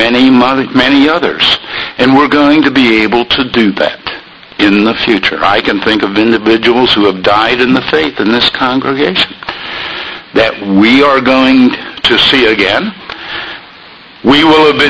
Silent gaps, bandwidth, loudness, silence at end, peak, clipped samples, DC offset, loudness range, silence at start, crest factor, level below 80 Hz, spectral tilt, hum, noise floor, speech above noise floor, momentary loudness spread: none; 11 kHz; -8 LUFS; 0 s; 0 dBFS; 0.8%; 0.2%; 2 LU; 0 s; 10 dB; -38 dBFS; -5.5 dB/octave; none; -34 dBFS; 26 dB; 13 LU